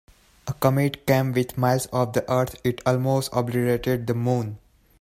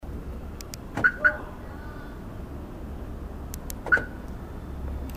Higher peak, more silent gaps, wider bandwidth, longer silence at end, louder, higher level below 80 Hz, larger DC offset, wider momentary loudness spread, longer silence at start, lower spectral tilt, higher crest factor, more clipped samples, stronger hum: first, -4 dBFS vs -8 dBFS; neither; about the same, 16 kHz vs 15.5 kHz; first, 0.45 s vs 0 s; first, -23 LUFS vs -30 LUFS; second, -52 dBFS vs -38 dBFS; neither; second, 5 LU vs 16 LU; first, 0.45 s vs 0 s; first, -6.5 dB/octave vs -5 dB/octave; about the same, 18 dB vs 22 dB; neither; neither